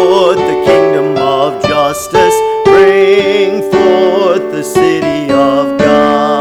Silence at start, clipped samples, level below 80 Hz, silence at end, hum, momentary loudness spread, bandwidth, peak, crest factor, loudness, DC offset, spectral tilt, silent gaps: 0 s; 0.8%; -42 dBFS; 0 s; none; 5 LU; 15.5 kHz; 0 dBFS; 8 dB; -9 LUFS; under 0.1%; -5 dB/octave; none